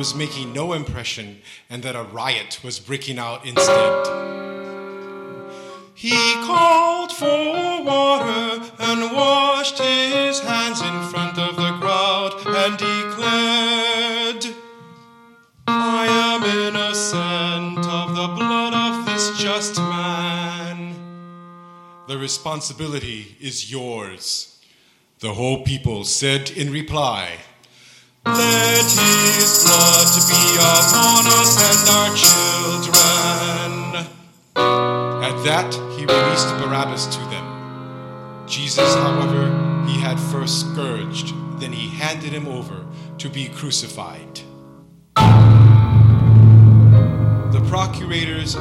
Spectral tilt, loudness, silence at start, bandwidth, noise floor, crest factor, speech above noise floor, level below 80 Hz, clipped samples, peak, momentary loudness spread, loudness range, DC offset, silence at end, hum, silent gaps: -3.5 dB/octave; -16 LUFS; 0 s; 16.5 kHz; -56 dBFS; 18 dB; 38 dB; -44 dBFS; under 0.1%; 0 dBFS; 20 LU; 15 LU; under 0.1%; 0 s; none; none